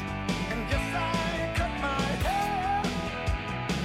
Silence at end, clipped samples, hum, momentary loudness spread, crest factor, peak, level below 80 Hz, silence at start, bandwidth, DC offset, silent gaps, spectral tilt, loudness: 0 s; under 0.1%; none; 3 LU; 14 dB; -16 dBFS; -38 dBFS; 0 s; 16.5 kHz; under 0.1%; none; -5 dB/octave; -29 LUFS